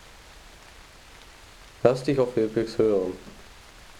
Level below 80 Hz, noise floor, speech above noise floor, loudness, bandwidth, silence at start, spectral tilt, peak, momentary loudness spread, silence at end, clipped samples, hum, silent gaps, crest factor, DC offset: -52 dBFS; -49 dBFS; 25 dB; -25 LUFS; 14.5 kHz; 0.45 s; -6.5 dB/octave; -6 dBFS; 25 LU; 0 s; under 0.1%; none; none; 22 dB; under 0.1%